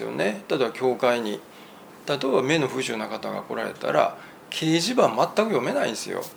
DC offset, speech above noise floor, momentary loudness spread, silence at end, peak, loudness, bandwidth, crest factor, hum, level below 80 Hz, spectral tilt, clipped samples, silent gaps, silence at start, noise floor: under 0.1%; 21 dB; 10 LU; 0 s; -4 dBFS; -24 LUFS; over 20 kHz; 22 dB; none; -72 dBFS; -4.5 dB/octave; under 0.1%; none; 0 s; -46 dBFS